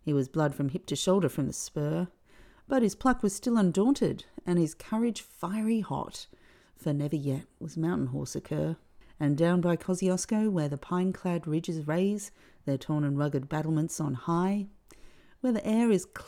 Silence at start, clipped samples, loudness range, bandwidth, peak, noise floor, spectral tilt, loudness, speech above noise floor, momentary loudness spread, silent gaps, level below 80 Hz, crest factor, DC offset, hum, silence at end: 0.05 s; under 0.1%; 4 LU; 16 kHz; -12 dBFS; -56 dBFS; -6.5 dB/octave; -30 LUFS; 28 dB; 10 LU; none; -58 dBFS; 18 dB; under 0.1%; none; 0 s